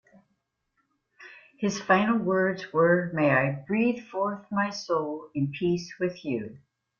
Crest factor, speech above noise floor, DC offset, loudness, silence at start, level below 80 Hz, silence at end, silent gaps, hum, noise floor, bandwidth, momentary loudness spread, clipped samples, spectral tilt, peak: 20 dB; 51 dB; under 0.1%; -27 LUFS; 1.2 s; -66 dBFS; 0.4 s; none; none; -77 dBFS; 7.2 kHz; 9 LU; under 0.1%; -6.5 dB/octave; -8 dBFS